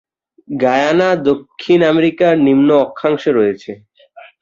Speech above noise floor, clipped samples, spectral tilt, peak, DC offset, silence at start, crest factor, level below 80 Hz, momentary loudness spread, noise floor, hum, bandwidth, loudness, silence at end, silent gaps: 29 dB; under 0.1%; -7 dB/octave; -2 dBFS; under 0.1%; 0.5 s; 12 dB; -56 dBFS; 9 LU; -42 dBFS; none; 7.4 kHz; -13 LUFS; 0.2 s; none